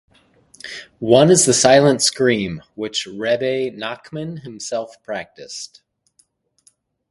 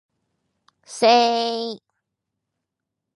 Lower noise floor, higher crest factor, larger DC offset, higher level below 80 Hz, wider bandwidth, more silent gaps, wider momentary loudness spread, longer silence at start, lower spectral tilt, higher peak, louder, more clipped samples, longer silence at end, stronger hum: second, -61 dBFS vs -82 dBFS; about the same, 20 dB vs 20 dB; neither; first, -56 dBFS vs -82 dBFS; about the same, 11.5 kHz vs 11.5 kHz; neither; about the same, 21 LU vs 22 LU; second, 0.65 s vs 0.9 s; about the same, -3.5 dB/octave vs -2.5 dB/octave; first, 0 dBFS vs -4 dBFS; about the same, -17 LUFS vs -19 LUFS; neither; about the same, 1.45 s vs 1.4 s; neither